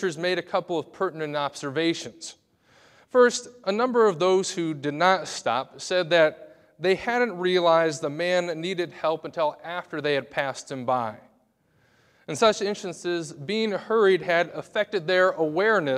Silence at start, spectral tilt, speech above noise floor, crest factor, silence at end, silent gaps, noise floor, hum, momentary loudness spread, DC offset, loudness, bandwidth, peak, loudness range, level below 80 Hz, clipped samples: 0 s; -4 dB/octave; 41 dB; 20 dB; 0 s; none; -65 dBFS; none; 10 LU; under 0.1%; -25 LUFS; 12.5 kHz; -6 dBFS; 5 LU; -70 dBFS; under 0.1%